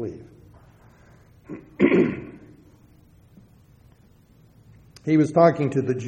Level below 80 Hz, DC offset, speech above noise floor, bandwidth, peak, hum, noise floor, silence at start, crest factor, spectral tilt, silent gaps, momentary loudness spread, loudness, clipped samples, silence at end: -58 dBFS; under 0.1%; 34 dB; 9.2 kHz; -4 dBFS; none; -55 dBFS; 0 s; 22 dB; -8 dB/octave; none; 23 LU; -21 LUFS; under 0.1%; 0 s